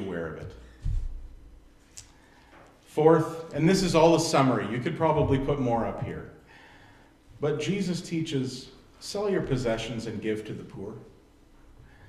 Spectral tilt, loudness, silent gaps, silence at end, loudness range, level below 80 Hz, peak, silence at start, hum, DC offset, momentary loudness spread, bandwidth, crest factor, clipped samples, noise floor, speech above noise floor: -6 dB/octave; -27 LUFS; none; 1 s; 9 LU; -44 dBFS; -6 dBFS; 0 s; none; under 0.1%; 22 LU; 13.5 kHz; 22 dB; under 0.1%; -56 dBFS; 30 dB